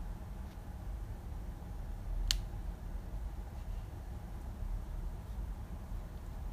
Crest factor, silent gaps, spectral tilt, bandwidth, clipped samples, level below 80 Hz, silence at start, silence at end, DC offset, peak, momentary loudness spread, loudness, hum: 34 dB; none; -4 dB/octave; 15.5 kHz; under 0.1%; -42 dBFS; 0 s; 0 s; under 0.1%; -6 dBFS; 10 LU; -44 LUFS; none